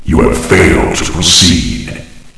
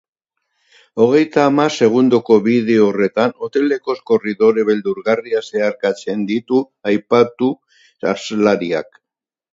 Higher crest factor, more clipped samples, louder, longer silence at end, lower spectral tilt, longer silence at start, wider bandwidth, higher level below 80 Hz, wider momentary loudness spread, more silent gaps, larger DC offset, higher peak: second, 10 dB vs 16 dB; first, 1% vs under 0.1%; first, -8 LUFS vs -16 LUFS; second, 0.15 s vs 0.7 s; second, -3.5 dB/octave vs -6 dB/octave; second, 0 s vs 0.95 s; first, 11 kHz vs 7.8 kHz; first, -20 dBFS vs -64 dBFS; first, 16 LU vs 8 LU; neither; neither; about the same, 0 dBFS vs 0 dBFS